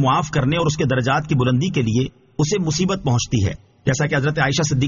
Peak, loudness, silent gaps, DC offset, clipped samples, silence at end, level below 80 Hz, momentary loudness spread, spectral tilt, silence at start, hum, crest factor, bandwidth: -4 dBFS; -20 LUFS; none; under 0.1%; under 0.1%; 0 s; -42 dBFS; 5 LU; -5.5 dB/octave; 0 s; none; 14 dB; 7.4 kHz